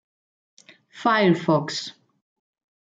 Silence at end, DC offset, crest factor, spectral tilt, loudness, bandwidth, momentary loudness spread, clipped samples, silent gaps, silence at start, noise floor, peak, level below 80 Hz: 0.9 s; under 0.1%; 18 dB; -5.5 dB/octave; -22 LUFS; 9 kHz; 12 LU; under 0.1%; none; 0.95 s; under -90 dBFS; -8 dBFS; -72 dBFS